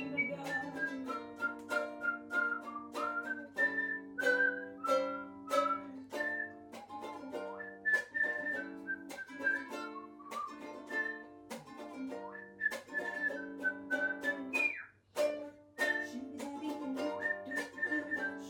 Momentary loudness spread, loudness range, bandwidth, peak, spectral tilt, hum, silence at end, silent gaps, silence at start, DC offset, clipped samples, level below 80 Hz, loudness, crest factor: 13 LU; 6 LU; 17 kHz; -18 dBFS; -3.5 dB/octave; none; 0 s; none; 0 s; under 0.1%; under 0.1%; -80 dBFS; -37 LUFS; 20 dB